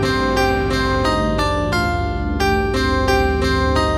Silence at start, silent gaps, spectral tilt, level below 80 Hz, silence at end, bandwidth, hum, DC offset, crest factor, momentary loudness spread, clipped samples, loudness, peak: 0 s; none; -5.5 dB/octave; -24 dBFS; 0 s; 15.5 kHz; 50 Hz at -45 dBFS; under 0.1%; 14 dB; 3 LU; under 0.1%; -18 LUFS; -4 dBFS